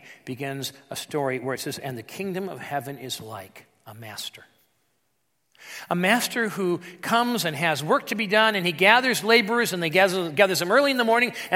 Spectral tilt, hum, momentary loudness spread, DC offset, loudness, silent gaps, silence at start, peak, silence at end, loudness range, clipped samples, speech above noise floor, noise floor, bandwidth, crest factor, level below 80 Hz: -3.5 dB/octave; none; 16 LU; under 0.1%; -23 LUFS; none; 0.05 s; 0 dBFS; 0 s; 15 LU; under 0.1%; 50 dB; -74 dBFS; 16.5 kHz; 24 dB; -76 dBFS